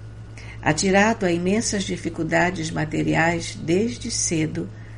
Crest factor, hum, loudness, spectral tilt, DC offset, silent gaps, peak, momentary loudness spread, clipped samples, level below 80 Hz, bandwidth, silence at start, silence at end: 16 dB; none; -22 LUFS; -4.5 dB/octave; under 0.1%; none; -6 dBFS; 9 LU; under 0.1%; -42 dBFS; 11.5 kHz; 0 s; 0 s